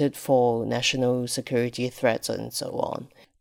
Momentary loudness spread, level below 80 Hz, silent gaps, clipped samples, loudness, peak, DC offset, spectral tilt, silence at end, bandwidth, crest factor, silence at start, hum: 8 LU; -60 dBFS; none; under 0.1%; -25 LUFS; -8 dBFS; under 0.1%; -4.5 dB/octave; 0.35 s; 17.5 kHz; 18 dB; 0 s; none